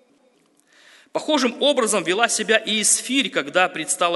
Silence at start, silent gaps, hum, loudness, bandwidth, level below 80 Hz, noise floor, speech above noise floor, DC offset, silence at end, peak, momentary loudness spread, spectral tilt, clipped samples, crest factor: 1.15 s; none; none; -19 LUFS; 12 kHz; -76 dBFS; -60 dBFS; 40 dB; under 0.1%; 0 s; 0 dBFS; 4 LU; -1.5 dB/octave; under 0.1%; 22 dB